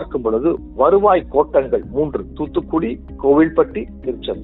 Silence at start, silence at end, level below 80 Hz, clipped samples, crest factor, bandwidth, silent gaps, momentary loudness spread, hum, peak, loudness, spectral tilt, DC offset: 0 s; 0 s; -38 dBFS; under 0.1%; 16 dB; 4.1 kHz; none; 12 LU; none; -2 dBFS; -18 LUFS; -11 dB/octave; under 0.1%